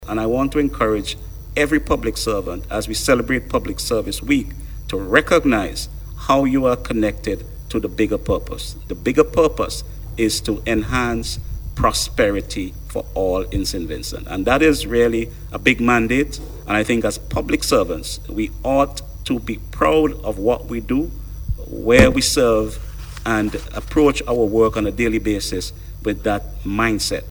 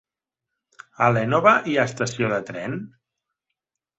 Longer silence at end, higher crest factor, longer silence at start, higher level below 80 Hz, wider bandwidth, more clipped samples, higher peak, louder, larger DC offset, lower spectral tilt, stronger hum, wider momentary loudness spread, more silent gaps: second, 0 s vs 1.1 s; about the same, 20 dB vs 22 dB; second, 0 s vs 1 s; first, -30 dBFS vs -60 dBFS; first, over 20 kHz vs 8.2 kHz; neither; about the same, 0 dBFS vs -2 dBFS; about the same, -19 LUFS vs -21 LUFS; neither; about the same, -4.5 dB/octave vs -5.5 dB/octave; neither; about the same, 13 LU vs 13 LU; neither